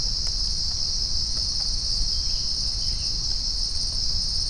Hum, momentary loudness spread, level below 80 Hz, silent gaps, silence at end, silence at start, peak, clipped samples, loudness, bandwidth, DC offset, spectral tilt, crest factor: none; 1 LU; -30 dBFS; none; 0 s; 0 s; -10 dBFS; under 0.1%; -24 LUFS; 10.5 kHz; under 0.1%; -1 dB/octave; 14 dB